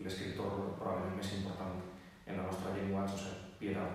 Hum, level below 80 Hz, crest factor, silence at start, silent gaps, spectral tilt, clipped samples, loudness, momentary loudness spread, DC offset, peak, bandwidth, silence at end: none; -66 dBFS; 14 dB; 0 s; none; -6 dB/octave; under 0.1%; -40 LUFS; 8 LU; under 0.1%; -26 dBFS; 15 kHz; 0 s